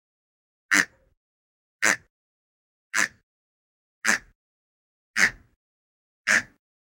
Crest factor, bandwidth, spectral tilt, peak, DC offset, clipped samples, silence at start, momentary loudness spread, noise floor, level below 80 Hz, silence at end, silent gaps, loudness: 28 dB; 17 kHz; -0.5 dB/octave; -2 dBFS; under 0.1%; under 0.1%; 0.7 s; 7 LU; under -90 dBFS; -64 dBFS; 0.55 s; 1.17-1.79 s, 2.10-2.90 s, 3.23-4.01 s, 4.35-5.14 s, 5.56-6.24 s; -24 LUFS